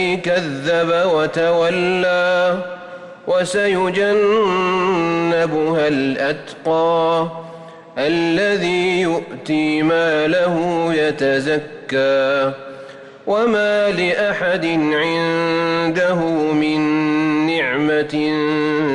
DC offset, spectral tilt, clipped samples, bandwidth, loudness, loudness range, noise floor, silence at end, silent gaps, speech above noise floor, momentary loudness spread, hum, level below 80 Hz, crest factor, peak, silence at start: under 0.1%; -5.5 dB/octave; under 0.1%; 11 kHz; -17 LUFS; 2 LU; -37 dBFS; 0 s; none; 20 dB; 7 LU; none; -56 dBFS; 10 dB; -8 dBFS; 0 s